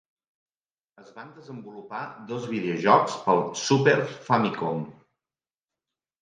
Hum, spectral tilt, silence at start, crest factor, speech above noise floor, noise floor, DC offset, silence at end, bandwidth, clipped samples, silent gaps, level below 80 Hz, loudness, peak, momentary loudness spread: none; -5 dB/octave; 1 s; 22 dB; over 65 dB; under -90 dBFS; under 0.1%; 1.3 s; 9.8 kHz; under 0.1%; none; -72 dBFS; -24 LUFS; -4 dBFS; 21 LU